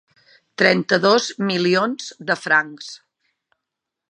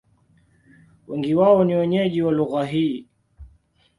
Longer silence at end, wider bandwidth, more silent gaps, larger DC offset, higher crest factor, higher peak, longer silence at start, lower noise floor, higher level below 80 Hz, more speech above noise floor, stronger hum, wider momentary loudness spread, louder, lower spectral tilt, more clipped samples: first, 1.15 s vs 0.55 s; about the same, 10.5 kHz vs 11 kHz; neither; neither; about the same, 20 dB vs 18 dB; first, 0 dBFS vs -4 dBFS; second, 0.6 s vs 1.1 s; first, -83 dBFS vs -59 dBFS; second, -72 dBFS vs -54 dBFS; first, 64 dB vs 40 dB; neither; first, 17 LU vs 12 LU; about the same, -18 LUFS vs -20 LUFS; second, -4 dB/octave vs -8.5 dB/octave; neither